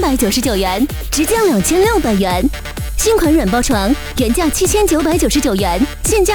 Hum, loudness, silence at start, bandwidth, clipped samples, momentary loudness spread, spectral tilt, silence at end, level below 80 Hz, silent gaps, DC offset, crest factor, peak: none; -14 LUFS; 0 s; over 20 kHz; under 0.1%; 5 LU; -4 dB/octave; 0 s; -24 dBFS; none; under 0.1%; 12 dB; -2 dBFS